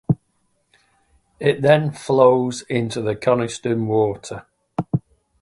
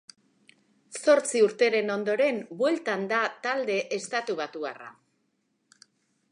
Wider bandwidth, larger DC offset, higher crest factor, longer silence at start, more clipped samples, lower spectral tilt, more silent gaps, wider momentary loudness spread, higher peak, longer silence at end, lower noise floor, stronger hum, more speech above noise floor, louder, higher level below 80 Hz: about the same, 11.5 kHz vs 11.5 kHz; neither; about the same, 20 dB vs 20 dB; second, 0.1 s vs 0.9 s; neither; first, -6.5 dB/octave vs -3.5 dB/octave; neither; about the same, 14 LU vs 13 LU; first, 0 dBFS vs -10 dBFS; second, 0.4 s vs 1.4 s; second, -67 dBFS vs -74 dBFS; neither; about the same, 48 dB vs 48 dB; first, -20 LUFS vs -26 LUFS; first, -56 dBFS vs -86 dBFS